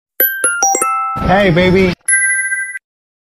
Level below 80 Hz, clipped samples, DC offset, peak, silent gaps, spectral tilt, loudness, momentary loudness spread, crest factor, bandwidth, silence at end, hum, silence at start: -34 dBFS; under 0.1%; under 0.1%; 0 dBFS; none; -3.5 dB/octave; -12 LUFS; 7 LU; 14 dB; 16 kHz; 0.45 s; none; 0.2 s